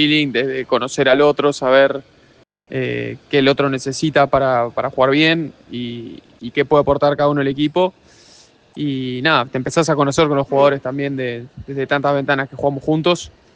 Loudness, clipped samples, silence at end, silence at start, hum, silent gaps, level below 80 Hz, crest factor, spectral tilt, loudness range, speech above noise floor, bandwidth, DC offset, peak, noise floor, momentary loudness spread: -17 LUFS; under 0.1%; 0.25 s; 0 s; none; none; -50 dBFS; 16 dB; -5.5 dB/octave; 2 LU; 36 dB; 9.6 kHz; under 0.1%; 0 dBFS; -52 dBFS; 12 LU